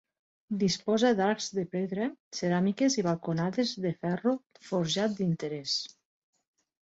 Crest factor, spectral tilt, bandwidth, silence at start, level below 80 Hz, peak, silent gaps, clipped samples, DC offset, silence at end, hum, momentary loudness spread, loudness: 16 dB; -5 dB/octave; 8 kHz; 0.5 s; -70 dBFS; -14 dBFS; 2.20-2.31 s; under 0.1%; under 0.1%; 1.05 s; none; 8 LU; -30 LUFS